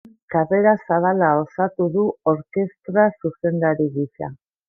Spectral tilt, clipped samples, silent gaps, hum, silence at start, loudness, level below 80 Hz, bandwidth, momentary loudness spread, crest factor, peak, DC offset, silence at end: -12.5 dB/octave; under 0.1%; none; none; 0.3 s; -20 LUFS; -62 dBFS; 2.4 kHz; 8 LU; 16 dB; -4 dBFS; under 0.1%; 0.35 s